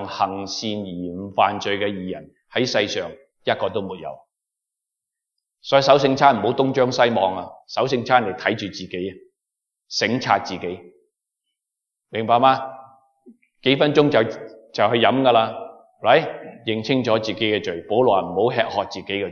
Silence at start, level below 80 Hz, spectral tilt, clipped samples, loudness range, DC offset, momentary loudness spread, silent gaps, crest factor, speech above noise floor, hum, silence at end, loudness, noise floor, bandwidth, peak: 0 s; -66 dBFS; -5 dB/octave; under 0.1%; 7 LU; under 0.1%; 15 LU; none; 20 dB; 64 dB; none; 0 s; -20 LUFS; -84 dBFS; 7.2 kHz; 0 dBFS